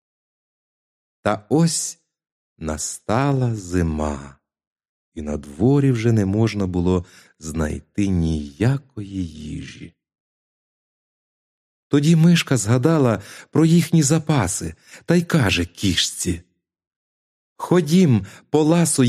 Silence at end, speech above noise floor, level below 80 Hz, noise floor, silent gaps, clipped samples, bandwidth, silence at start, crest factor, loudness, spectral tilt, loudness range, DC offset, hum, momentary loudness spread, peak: 0 s; over 71 dB; -42 dBFS; under -90 dBFS; 2.32-2.56 s, 4.67-4.76 s, 4.89-5.12 s, 10.20-11.90 s, 16.87-17.56 s; under 0.1%; 14.5 kHz; 1.25 s; 18 dB; -20 LUFS; -5.5 dB/octave; 7 LU; under 0.1%; none; 14 LU; -2 dBFS